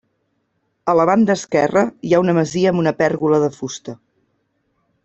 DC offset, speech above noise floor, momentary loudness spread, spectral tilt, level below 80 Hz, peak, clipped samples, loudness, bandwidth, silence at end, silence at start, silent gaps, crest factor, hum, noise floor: under 0.1%; 52 dB; 13 LU; -6 dB/octave; -56 dBFS; -2 dBFS; under 0.1%; -17 LUFS; 8.2 kHz; 1.1 s; 0.85 s; none; 16 dB; none; -68 dBFS